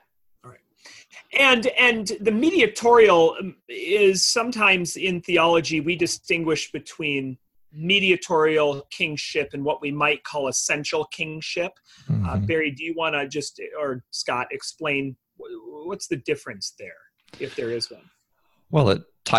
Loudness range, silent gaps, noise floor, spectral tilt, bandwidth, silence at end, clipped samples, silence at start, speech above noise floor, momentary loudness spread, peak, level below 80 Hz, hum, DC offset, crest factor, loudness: 11 LU; none; -68 dBFS; -3.5 dB/octave; 12.5 kHz; 0 s; under 0.1%; 0.45 s; 46 dB; 16 LU; -2 dBFS; -52 dBFS; none; under 0.1%; 22 dB; -22 LUFS